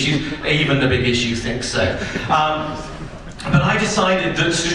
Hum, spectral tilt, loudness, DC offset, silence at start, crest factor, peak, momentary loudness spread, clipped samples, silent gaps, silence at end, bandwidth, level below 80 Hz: none; -4.5 dB/octave; -18 LUFS; under 0.1%; 0 s; 16 dB; -2 dBFS; 13 LU; under 0.1%; none; 0 s; 11 kHz; -36 dBFS